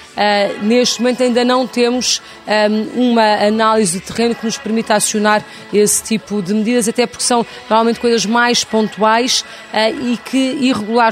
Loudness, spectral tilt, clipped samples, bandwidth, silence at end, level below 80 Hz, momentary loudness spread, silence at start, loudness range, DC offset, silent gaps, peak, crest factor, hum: -14 LUFS; -3 dB/octave; under 0.1%; 16 kHz; 0 s; -56 dBFS; 5 LU; 0 s; 1 LU; under 0.1%; none; 0 dBFS; 14 dB; none